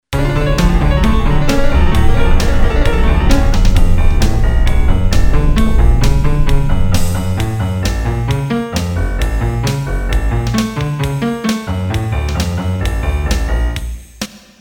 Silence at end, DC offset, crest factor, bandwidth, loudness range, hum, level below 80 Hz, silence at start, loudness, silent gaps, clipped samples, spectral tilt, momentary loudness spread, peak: 0.25 s; under 0.1%; 12 dB; 16.5 kHz; 3 LU; none; -14 dBFS; 0.1 s; -16 LUFS; none; under 0.1%; -6 dB/octave; 5 LU; 0 dBFS